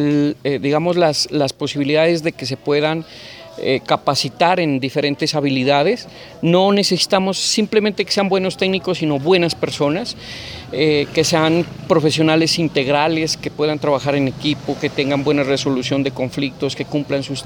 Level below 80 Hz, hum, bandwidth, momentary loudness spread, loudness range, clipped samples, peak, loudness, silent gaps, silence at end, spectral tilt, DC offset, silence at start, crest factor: -52 dBFS; none; over 20 kHz; 7 LU; 2 LU; under 0.1%; 0 dBFS; -17 LUFS; none; 0 s; -4.5 dB/octave; under 0.1%; 0 s; 16 dB